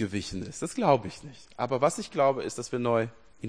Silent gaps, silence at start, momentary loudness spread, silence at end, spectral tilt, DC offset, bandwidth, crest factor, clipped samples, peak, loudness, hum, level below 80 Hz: none; 0 s; 12 LU; 0 s; -5.5 dB/octave; 0.2%; 10.5 kHz; 20 dB; under 0.1%; -8 dBFS; -28 LUFS; none; -58 dBFS